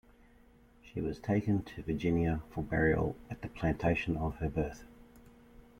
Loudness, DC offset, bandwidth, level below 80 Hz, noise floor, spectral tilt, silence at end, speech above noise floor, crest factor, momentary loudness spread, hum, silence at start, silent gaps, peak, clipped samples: -34 LUFS; under 0.1%; 15 kHz; -48 dBFS; -61 dBFS; -8 dB/octave; 0.6 s; 28 dB; 18 dB; 10 LU; none; 0.85 s; none; -16 dBFS; under 0.1%